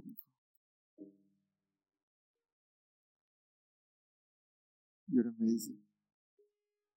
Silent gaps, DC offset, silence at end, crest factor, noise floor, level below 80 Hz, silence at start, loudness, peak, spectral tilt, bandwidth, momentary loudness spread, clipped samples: 0.38-0.97 s, 2.03-2.34 s, 2.52-5.07 s; under 0.1%; 1.2 s; 24 dB; -89 dBFS; under -90 dBFS; 0.05 s; -36 LUFS; -20 dBFS; -6 dB/octave; 16 kHz; 21 LU; under 0.1%